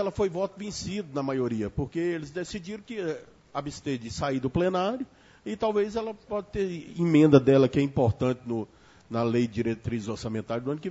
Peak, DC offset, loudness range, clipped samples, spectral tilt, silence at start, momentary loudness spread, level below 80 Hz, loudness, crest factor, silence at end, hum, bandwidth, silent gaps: -4 dBFS; under 0.1%; 8 LU; under 0.1%; -7 dB/octave; 0 s; 14 LU; -52 dBFS; -28 LUFS; 22 dB; 0 s; none; 8 kHz; none